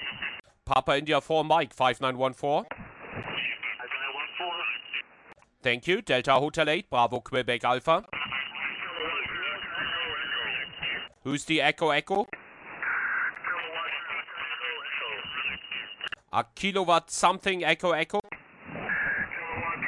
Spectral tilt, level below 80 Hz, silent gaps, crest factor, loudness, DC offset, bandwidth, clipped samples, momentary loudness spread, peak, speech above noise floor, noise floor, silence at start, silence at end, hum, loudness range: -3.5 dB/octave; -60 dBFS; none; 22 dB; -28 LUFS; under 0.1%; 12 kHz; under 0.1%; 11 LU; -8 dBFS; 29 dB; -56 dBFS; 0 s; 0 s; none; 5 LU